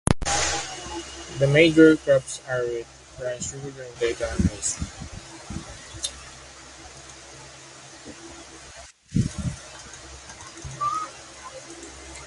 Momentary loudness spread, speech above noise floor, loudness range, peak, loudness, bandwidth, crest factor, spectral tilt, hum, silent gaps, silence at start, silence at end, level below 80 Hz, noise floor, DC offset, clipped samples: 22 LU; 24 dB; 16 LU; 0 dBFS; -24 LUFS; 11.5 kHz; 26 dB; -4.5 dB/octave; none; none; 0.05 s; 0 s; -42 dBFS; -46 dBFS; under 0.1%; under 0.1%